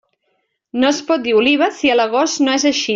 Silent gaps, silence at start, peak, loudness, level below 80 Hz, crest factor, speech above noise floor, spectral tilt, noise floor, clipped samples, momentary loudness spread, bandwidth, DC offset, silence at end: none; 0.75 s; -2 dBFS; -15 LUFS; -60 dBFS; 14 dB; 53 dB; -2 dB/octave; -68 dBFS; under 0.1%; 4 LU; 7.6 kHz; under 0.1%; 0 s